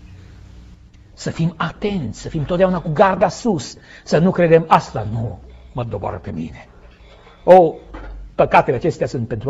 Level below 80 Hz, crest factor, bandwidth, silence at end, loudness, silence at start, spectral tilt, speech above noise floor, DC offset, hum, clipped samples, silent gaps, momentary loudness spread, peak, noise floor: -40 dBFS; 18 dB; 8 kHz; 0 s; -17 LUFS; 0.05 s; -7 dB/octave; 27 dB; under 0.1%; none; under 0.1%; none; 19 LU; 0 dBFS; -44 dBFS